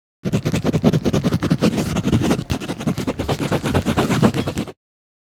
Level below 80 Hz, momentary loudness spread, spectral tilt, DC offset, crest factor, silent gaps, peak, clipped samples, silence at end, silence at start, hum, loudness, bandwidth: -38 dBFS; 7 LU; -6 dB/octave; under 0.1%; 20 dB; none; 0 dBFS; under 0.1%; 0.5 s; 0.25 s; none; -20 LUFS; 17.5 kHz